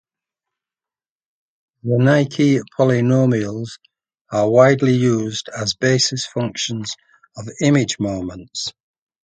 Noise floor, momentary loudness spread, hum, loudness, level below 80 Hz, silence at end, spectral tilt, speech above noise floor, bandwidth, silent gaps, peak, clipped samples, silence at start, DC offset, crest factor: under -90 dBFS; 15 LU; none; -18 LUFS; -54 dBFS; 0.55 s; -5.5 dB/octave; over 73 dB; 9.4 kHz; 4.21-4.25 s; 0 dBFS; under 0.1%; 1.85 s; under 0.1%; 18 dB